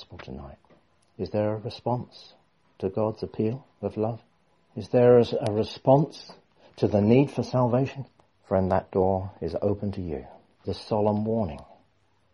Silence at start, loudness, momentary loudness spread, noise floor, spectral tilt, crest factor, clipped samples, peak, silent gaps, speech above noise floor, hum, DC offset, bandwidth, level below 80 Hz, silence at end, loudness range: 0 s; -26 LUFS; 21 LU; -67 dBFS; -8.5 dB/octave; 20 dB; under 0.1%; -6 dBFS; none; 42 dB; none; under 0.1%; 11 kHz; -54 dBFS; 0.7 s; 8 LU